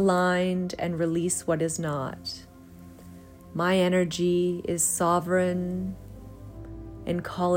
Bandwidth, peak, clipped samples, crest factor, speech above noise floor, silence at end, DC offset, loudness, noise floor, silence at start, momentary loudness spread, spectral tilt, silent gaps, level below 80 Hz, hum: 16 kHz; -12 dBFS; under 0.1%; 14 dB; 22 dB; 0 s; under 0.1%; -26 LUFS; -47 dBFS; 0 s; 21 LU; -5 dB/octave; none; -52 dBFS; none